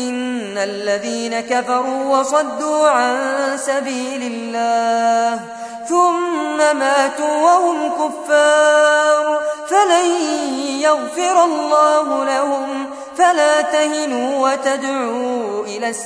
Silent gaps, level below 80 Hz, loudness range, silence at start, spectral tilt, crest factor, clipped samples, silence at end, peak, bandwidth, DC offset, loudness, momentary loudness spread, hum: none; -68 dBFS; 3 LU; 0 s; -2 dB/octave; 14 dB; under 0.1%; 0 s; -2 dBFS; 11 kHz; under 0.1%; -16 LUFS; 9 LU; none